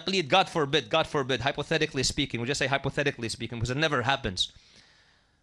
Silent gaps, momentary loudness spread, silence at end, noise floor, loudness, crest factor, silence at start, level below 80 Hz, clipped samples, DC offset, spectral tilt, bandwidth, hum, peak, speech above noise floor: none; 7 LU; 0.9 s; -63 dBFS; -27 LUFS; 20 dB; 0 s; -50 dBFS; under 0.1%; under 0.1%; -4 dB/octave; 14.5 kHz; none; -8 dBFS; 35 dB